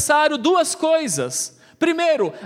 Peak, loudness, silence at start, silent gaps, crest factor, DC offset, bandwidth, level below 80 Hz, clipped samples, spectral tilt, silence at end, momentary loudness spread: -4 dBFS; -19 LUFS; 0 s; none; 16 dB; under 0.1%; 16 kHz; -68 dBFS; under 0.1%; -2.5 dB/octave; 0 s; 7 LU